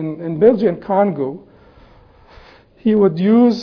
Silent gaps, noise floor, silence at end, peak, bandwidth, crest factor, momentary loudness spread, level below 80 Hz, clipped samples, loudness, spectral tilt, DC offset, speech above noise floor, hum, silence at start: none; -46 dBFS; 0 s; 0 dBFS; 5.4 kHz; 16 dB; 12 LU; -52 dBFS; under 0.1%; -16 LUFS; -9 dB/octave; under 0.1%; 32 dB; none; 0 s